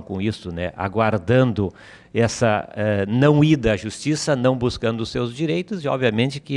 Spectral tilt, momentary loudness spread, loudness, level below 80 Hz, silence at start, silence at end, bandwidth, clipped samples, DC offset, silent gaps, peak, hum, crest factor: -6 dB/octave; 9 LU; -21 LUFS; -44 dBFS; 0 s; 0 s; 11 kHz; under 0.1%; under 0.1%; none; -6 dBFS; none; 16 dB